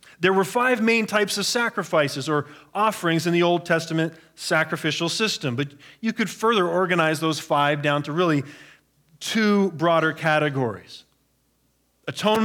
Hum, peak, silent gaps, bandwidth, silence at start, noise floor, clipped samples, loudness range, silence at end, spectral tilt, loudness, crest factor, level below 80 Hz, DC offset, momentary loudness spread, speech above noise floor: none; -6 dBFS; none; 19 kHz; 0.2 s; -67 dBFS; under 0.1%; 2 LU; 0 s; -4.5 dB/octave; -22 LUFS; 18 dB; -72 dBFS; under 0.1%; 9 LU; 44 dB